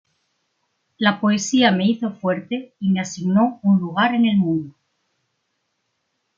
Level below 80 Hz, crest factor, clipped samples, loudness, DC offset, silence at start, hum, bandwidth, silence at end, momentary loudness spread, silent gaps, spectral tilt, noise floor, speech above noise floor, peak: -66 dBFS; 18 dB; under 0.1%; -19 LUFS; under 0.1%; 1 s; none; 7.6 kHz; 1.7 s; 8 LU; none; -5.5 dB/octave; -73 dBFS; 54 dB; -4 dBFS